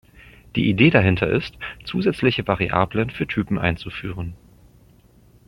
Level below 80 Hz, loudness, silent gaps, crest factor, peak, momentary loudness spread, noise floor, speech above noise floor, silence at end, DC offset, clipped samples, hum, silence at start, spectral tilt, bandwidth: -44 dBFS; -21 LUFS; none; 20 dB; -2 dBFS; 16 LU; -53 dBFS; 32 dB; 1.1 s; under 0.1%; under 0.1%; none; 0.25 s; -8 dB/octave; 11.5 kHz